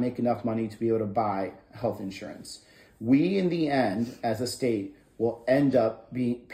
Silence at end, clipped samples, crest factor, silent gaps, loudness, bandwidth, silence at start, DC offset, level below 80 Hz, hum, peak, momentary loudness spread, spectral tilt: 0 s; under 0.1%; 18 dB; none; -28 LUFS; 15.5 kHz; 0 s; under 0.1%; -62 dBFS; none; -10 dBFS; 14 LU; -6.5 dB/octave